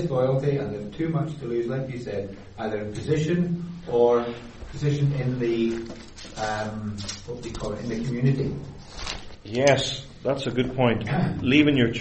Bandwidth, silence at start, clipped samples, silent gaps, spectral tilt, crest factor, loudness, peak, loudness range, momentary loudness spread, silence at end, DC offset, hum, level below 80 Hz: 8.4 kHz; 0 s; under 0.1%; none; -6 dB/octave; 20 dB; -25 LUFS; -6 dBFS; 5 LU; 14 LU; 0 s; under 0.1%; none; -46 dBFS